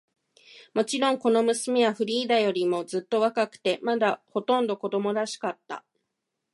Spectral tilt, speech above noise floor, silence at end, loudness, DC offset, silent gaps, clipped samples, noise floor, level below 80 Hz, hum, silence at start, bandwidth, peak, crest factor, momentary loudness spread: -4 dB/octave; 57 dB; 0.75 s; -26 LUFS; under 0.1%; none; under 0.1%; -82 dBFS; -80 dBFS; none; 0.55 s; 11.5 kHz; -10 dBFS; 16 dB; 8 LU